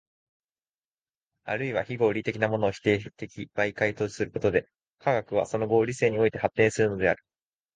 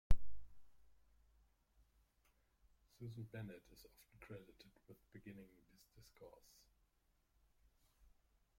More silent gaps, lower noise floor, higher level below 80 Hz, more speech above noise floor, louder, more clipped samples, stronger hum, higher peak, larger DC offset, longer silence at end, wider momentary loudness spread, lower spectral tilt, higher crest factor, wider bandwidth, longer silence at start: first, 4.93-4.97 s vs none; first, under -90 dBFS vs -80 dBFS; about the same, -58 dBFS vs -54 dBFS; first, over 64 dB vs 23 dB; first, -27 LUFS vs -55 LUFS; neither; neither; first, -8 dBFS vs -18 dBFS; neither; second, 0.6 s vs 3.25 s; second, 8 LU vs 15 LU; about the same, -6 dB/octave vs -6.5 dB/octave; second, 20 dB vs 26 dB; second, 9.6 kHz vs 15 kHz; first, 1.45 s vs 0.1 s